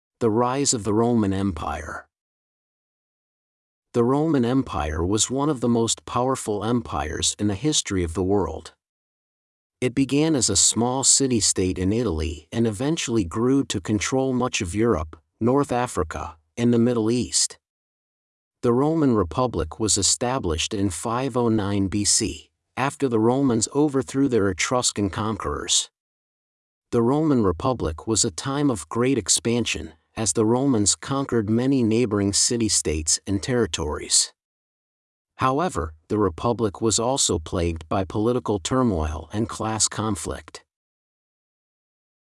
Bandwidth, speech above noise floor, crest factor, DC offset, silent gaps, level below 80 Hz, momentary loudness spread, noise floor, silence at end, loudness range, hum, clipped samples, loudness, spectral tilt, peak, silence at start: 12 kHz; over 68 dB; 20 dB; under 0.1%; 2.21-3.82 s, 8.89-9.70 s, 17.70-18.51 s, 26.00-26.82 s, 34.45-35.25 s; -46 dBFS; 8 LU; under -90 dBFS; 1.75 s; 5 LU; none; under 0.1%; -22 LUFS; -4 dB/octave; -4 dBFS; 0.2 s